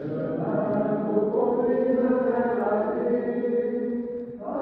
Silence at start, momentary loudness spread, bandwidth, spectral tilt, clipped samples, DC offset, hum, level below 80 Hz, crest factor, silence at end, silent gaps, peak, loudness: 0 s; 7 LU; 4.3 kHz; -11.5 dB/octave; under 0.1%; under 0.1%; none; -60 dBFS; 14 dB; 0 s; none; -10 dBFS; -25 LUFS